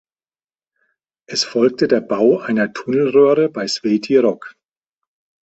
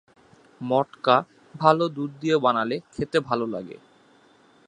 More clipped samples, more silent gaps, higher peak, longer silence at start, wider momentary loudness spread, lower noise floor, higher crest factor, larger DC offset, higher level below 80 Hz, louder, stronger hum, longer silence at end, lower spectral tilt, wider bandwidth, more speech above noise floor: neither; neither; about the same, 0 dBFS vs -2 dBFS; first, 1.3 s vs 0.6 s; second, 8 LU vs 13 LU; first, under -90 dBFS vs -57 dBFS; second, 18 dB vs 24 dB; neither; about the same, -62 dBFS vs -62 dBFS; first, -16 LUFS vs -24 LUFS; neither; about the same, 0.9 s vs 0.95 s; second, -5 dB/octave vs -6.5 dB/octave; second, 8.2 kHz vs 10 kHz; first, over 74 dB vs 34 dB